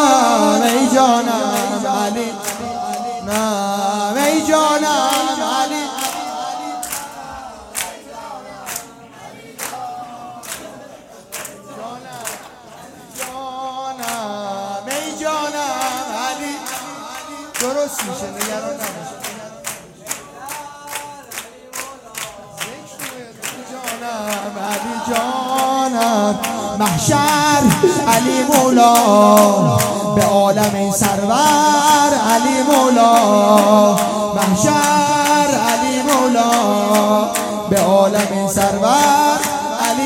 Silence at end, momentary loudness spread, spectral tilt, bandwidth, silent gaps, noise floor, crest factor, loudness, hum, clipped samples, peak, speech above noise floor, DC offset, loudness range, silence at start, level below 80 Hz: 0 s; 18 LU; -3.5 dB/octave; 17 kHz; none; -39 dBFS; 16 dB; -15 LUFS; none; under 0.1%; 0 dBFS; 27 dB; under 0.1%; 16 LU; 0 s; -52 dBFS